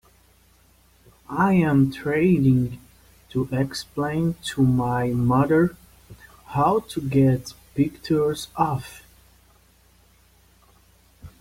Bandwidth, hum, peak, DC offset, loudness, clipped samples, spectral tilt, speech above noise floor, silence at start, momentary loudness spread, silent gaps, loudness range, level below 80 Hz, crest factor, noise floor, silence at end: 16 kHz; none; -6 dBFS; under 0.1%; -22 LUFS; under 0.1%; -7.5 dB/octave; 36 dB; 1.3 s; 11 LU; none; 6 LU; -50 dBFS; 16 dB; -57 dBFS; 0.1 s